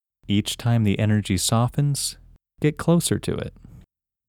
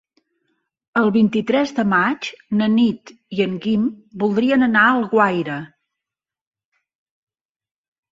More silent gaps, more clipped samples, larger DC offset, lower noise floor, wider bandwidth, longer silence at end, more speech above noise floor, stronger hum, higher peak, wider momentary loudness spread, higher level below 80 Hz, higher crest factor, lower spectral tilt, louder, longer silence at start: neither; neither; neither; second, -55 dBFS vs -87 dBFS; first, 17 kHz vs 7.6 kHz; second, 0.5 s vs 2.45 s; second, 33 dB vs 70 dB; neither; second, -8 dBFS vs -2 dBFS; about the same, 8 LU vs 10 LU; first, -48 dBFS vs -62 dBFS; about the same, 16 dB vs 18 dB; second, -5 dB/octave vs -6.5 dB/octave; second, -22 LUFS vs -18 LUFS; second, 0.3 s vs 0.95 s